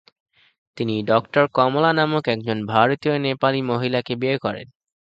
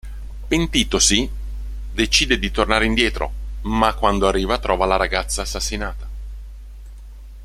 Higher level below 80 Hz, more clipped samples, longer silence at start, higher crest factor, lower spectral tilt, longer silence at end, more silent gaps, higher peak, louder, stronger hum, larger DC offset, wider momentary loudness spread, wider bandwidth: second, -60 dBFS vs -28 dBFS; neither; first, 0.75 s vs 0.05 s; about the same, 20 dB vs 20 dB; first, -8 dB/octave vs -3 dB/octave; first, 0.45 s vs 0 s; neither; about the same, 0 dBFS vs 0 dBFS; about the same, -20 LUFS vs -19 LUFS; second, none vs 50 Hz at -30 dBFS; neither; second, 7 LU vs 19 LU; second, 8 kHz vs 15 kHz